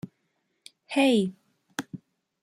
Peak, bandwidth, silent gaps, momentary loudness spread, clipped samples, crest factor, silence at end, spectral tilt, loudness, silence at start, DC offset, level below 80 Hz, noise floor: -12 dBFS; 15 kHz; none; 23 LU; under 0.1%; 18 dB; 0.45 s; -5 dB/octave; -26 LUFS; 0.05 s; under 0.1%; -74 dBFS; -75 dBFS